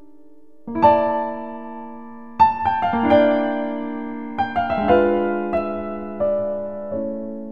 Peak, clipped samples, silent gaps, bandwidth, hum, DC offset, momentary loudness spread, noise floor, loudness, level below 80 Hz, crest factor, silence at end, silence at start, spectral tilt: -2 dBFS; under 0.1%; none; 5.8 kHz; none; 0.9%; 17 LU; -52 dBFS; -20 LUFS; -50 dBFS; 18 dB; 0 s; 0.65 s; -8.5 dB/octave